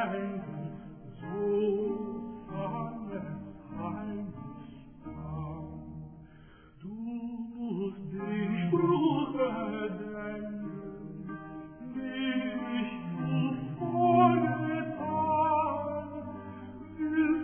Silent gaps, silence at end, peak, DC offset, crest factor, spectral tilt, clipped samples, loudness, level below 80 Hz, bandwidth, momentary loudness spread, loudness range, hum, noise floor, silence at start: none; 0 s; -10 dBFS; under 0.1%; 22 dB; -11 dB/octave; under 0.1%; -32 LUFS; -58 dBFS; 3.5 kHz; 18 LU; 13 LU; none; -54 dBFS; 0 s